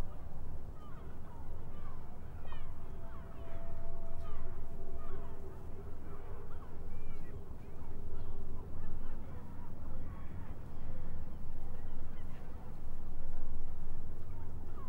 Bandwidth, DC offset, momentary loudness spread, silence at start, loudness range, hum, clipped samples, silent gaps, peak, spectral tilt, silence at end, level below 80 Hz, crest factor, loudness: 2 kHz; under 0.1%; 4 LU; 0 s; 2 LU; none; under 0.1%; none; -20 dBFS; -8 dB/octave; 0 s; -38 dBFS; 12 dB; -49 LUFS